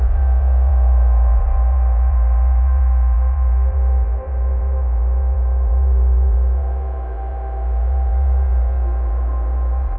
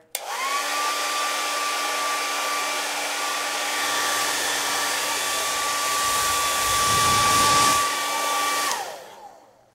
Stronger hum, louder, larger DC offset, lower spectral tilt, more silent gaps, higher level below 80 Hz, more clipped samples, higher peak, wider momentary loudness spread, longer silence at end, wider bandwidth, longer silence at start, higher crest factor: neither; first, -18 LUFS vs -22 LUFS; neither; first, -12 dB/octave vs -0.5 dB/octave; neither; first, -14 dBFS vs -54 dBFS; neither; about the same, -8 dBFS vs -6 dBFS; about the same, 6 LU vs 7 LU; second, 0 s vs 0.4 s; second, 2.2 kHz vs 16 kHz; second, 0 s vs 0.15 s; second, 8 dB vs 18 dB